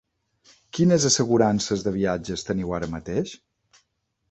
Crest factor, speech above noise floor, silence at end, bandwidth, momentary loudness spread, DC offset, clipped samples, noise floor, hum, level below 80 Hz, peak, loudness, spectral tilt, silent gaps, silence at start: 20 dB; 51 dB; 0.95 s; 8.2 kHz; 10 LU; under 0.1%; under 0.1%; -74 dBFS; none; -50 dBFS; -6 dBFS; -23 LUFS; -4.5 dB/octave; none; 0.75 s